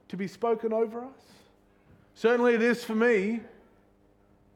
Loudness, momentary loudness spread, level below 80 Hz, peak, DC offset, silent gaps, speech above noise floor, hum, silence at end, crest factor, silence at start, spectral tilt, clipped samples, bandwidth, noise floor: -27 LUFS; 14 LU; -70 dBFS; -12 dBFS; under 0.1%; none; 36 dB; none; 1.1 s; 16 dB; 0.1 s; -6 dB/octave; under 0.1%; 14 kHz; -63 dBFS